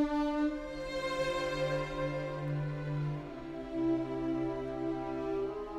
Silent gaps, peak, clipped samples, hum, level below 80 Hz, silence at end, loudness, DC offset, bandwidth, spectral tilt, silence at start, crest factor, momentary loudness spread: none; -20 dBFS; under 0.1%; none; -52 dBFS; 0 s; -35 LUFS; under 0.1%; 12.5 kHz; -7 dB/octave; 0 s; 14 dB; 6 LU